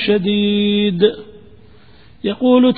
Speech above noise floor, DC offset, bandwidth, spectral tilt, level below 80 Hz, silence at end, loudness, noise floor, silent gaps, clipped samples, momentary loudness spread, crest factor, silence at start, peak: 32 dB; 0.5%; 4.9 kHz; -11.5 dB/octave; -50 dBFS; 0 s; -16 LUFS; -46 dBFS; none; under 0.1%; 11 LU; 16 dB; 0 s; 0 dBFS